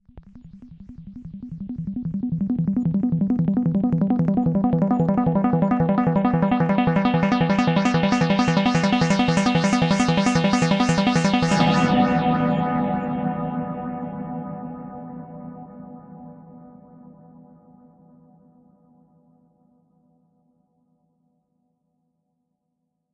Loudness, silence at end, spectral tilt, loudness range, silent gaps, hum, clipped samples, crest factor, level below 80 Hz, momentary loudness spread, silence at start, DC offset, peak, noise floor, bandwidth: -20 LUFS; 6.45 s; -6.5 dB/octave; 15 LU; none; none; under 0.1%; 16 dB; -50 dBFS; 18 LU; 0.15 s; under 0.1%; -6 dBFS; -76 dBFS; 10 kHz